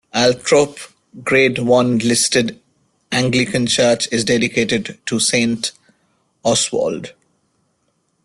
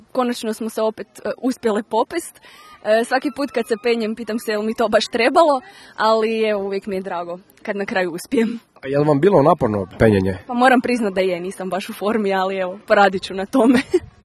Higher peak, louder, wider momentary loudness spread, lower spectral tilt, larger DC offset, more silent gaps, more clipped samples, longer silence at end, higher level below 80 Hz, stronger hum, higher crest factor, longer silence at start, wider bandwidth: about the same, -2 dBFS vs 0 dBFS; first, -16 LUFS vs -19 LUFS; about the same, 10 LU vs 11 LU; second, -3.5 dB/octave vs -5.5 dB/octave; neither; neither; neither; first, 1.15 s vs 0.15 s; about the same, -54 dBFS vs -50 dBFS; neither; about the same, 16 dB vs 18 dB; about the same, 0.15 s vs 0.15 s; about the same, 12.5 kHz vs 13 kHz